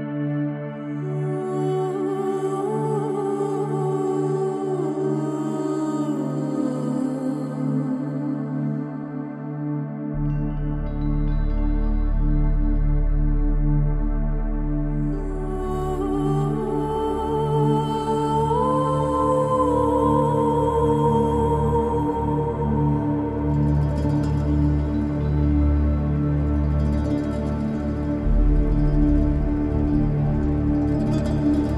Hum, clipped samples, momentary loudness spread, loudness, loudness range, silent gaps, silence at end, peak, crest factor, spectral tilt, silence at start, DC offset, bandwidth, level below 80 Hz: none; under 0.1%; 7 LU; -23 LUFS; 6 LU; none; 0 s; -6 dBFS; 14 dB; -9 dB/octave; 0 s; under 0.1%; 11.5 kHz; -26 dBFS